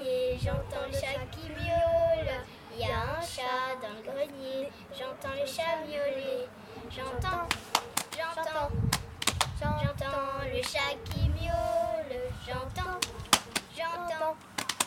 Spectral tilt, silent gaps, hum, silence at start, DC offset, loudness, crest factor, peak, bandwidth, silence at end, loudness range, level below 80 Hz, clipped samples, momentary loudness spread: -3.5 dB/octave; none; none; 0 s; under 0.1%; -32 LUFS; 28 dB; -4 dBFS; 18 kHz; 0 s; 4 LU; -46 dBFS; under 0.1%; 10 LU